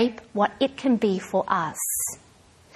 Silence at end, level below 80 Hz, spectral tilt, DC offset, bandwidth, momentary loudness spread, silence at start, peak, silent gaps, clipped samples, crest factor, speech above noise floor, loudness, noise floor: 0.6 s; -62 dBFS; -4 dB/octave; under 0.1%; 14 kHz; 4 LU; 0 s; -6 dBFS; none; under 0.1%; 18 dB; 30 dB; -25 LUFS; -54 dBFS